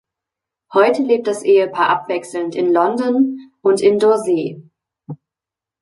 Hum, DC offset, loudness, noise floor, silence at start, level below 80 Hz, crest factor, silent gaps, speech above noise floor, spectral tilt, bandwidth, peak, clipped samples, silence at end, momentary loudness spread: none; under 0.1%; -16 LUFS; -87 dBFS; 0.7 s; -68 dBFS; 16 dB; none; 72 dB; -5.5 dB/octave; 11.5 kHz; -2 dBFS; under 0.1%; 0.65 s; 12 LU